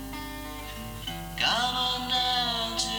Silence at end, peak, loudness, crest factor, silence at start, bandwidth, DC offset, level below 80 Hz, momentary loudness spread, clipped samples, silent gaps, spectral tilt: 0 s; -12 dBFS; -27 LUFS; 18 dB; 0 s; over 20 kHz; under 0.1%; -46 dBFS; 13 LU; under 0.1%; none; -2 dB/octave